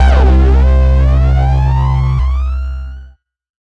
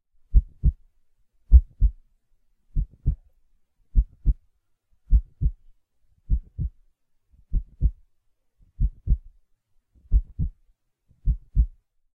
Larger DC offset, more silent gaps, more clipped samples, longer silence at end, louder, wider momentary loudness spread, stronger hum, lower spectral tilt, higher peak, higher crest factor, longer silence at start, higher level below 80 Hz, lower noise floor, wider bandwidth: neither; neither; neither; first, 0.7 s vs 0.5 s; first, -12 LUFS vs -28 LUFS; about the same, 12 LU vs 12 LU; neither; second, -8.5 dB/octave vs -13.5 dB/octave; about the same, -2 dBFS vs -2 dBFS; second, 8 dB vs 22 dB; second, 0 s vs 0.3 s; first, -12 dBFS vs -26 dBFS; second, -39 dBFS vs -66 dBFS; first, 5.6 kHz vs 0.6 kHz